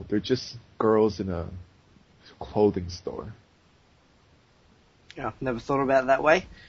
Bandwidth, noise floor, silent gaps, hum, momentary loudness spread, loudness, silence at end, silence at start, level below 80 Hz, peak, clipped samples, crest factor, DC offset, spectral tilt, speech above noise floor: 7.6 kHz; -60 dBFS; none; none; 19 LU; -26 LUFS; 0.05 s; 0 s; -52 dBFS; -6 dBFS; under 0.1%; 22 dB; under 0.1%; -4.5 dB/octave; 35 dB